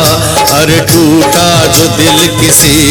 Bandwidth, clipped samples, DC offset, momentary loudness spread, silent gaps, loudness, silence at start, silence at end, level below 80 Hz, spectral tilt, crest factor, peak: over 20 kHz; 3%; under 0.1%; 3 LU; none; -5 LUFS; 0 s; 0 s; -28 dBFS; -3.5 dB/octave; 6 dB; 0 dBFS